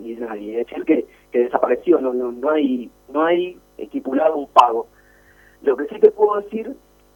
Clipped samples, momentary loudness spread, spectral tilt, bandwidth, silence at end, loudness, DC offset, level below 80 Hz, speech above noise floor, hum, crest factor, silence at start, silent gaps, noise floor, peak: under 0.1%; 15 LU; -6 dB/octave; 17.5 kHz; 0.4 s; -19 LUFS; under 0.1%; -58 dBFS; 33 dB; 50 Hz at -60 dBFS; 20 dB; 0 s; none; -51 dBFS; 0 dBFS